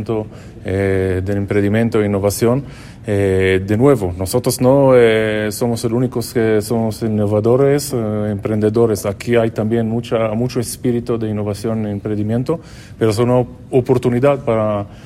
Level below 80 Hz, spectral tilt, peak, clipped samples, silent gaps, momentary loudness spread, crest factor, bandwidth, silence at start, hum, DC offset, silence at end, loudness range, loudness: -42 dBFS; -6.5 dB/octave; 0 dBFS; under 0.1%; none; 8 LU; 16 dB; 16 kHz; 0 s; none; under 0.1%; 0 s; 4 LU; -16 LUFS